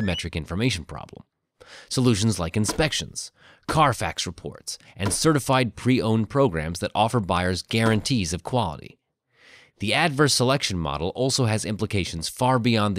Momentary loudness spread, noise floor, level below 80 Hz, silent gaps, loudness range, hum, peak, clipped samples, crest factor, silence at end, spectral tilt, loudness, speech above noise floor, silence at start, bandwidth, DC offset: 12 LU; -58 dBFS; -46 dBFS; none; 3 LU; none; -6 dBFS; under 0.1%; 18 dB; 0 s; -4.5 dB/octave; -23 LUFS; 35 dB; 0 s; 15.5 kHz; under 0.1%